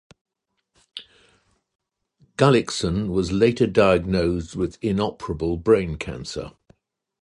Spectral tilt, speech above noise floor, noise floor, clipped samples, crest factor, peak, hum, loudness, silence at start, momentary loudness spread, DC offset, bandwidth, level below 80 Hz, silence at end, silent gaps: -6 dB/octave; 54 dB; -75 dBFS; under 0.1%; 20 dB; -4 dBFS; none; -22 LUFS; 0.95 s; 20 LU; under 0.1%; 11.5 kHz; -42 dBFS; 0.75 s; 1.75-1.79 s